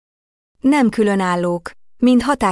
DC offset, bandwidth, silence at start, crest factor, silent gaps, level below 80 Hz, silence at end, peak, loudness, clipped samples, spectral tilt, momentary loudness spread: under 0.1%; 12 kHz; 0.65 s; 14 dB; none; -46 dBFS; 0 s; -4 dBFS; -17 LUFS; under 0.1%; -6 dB/octave; 8 LU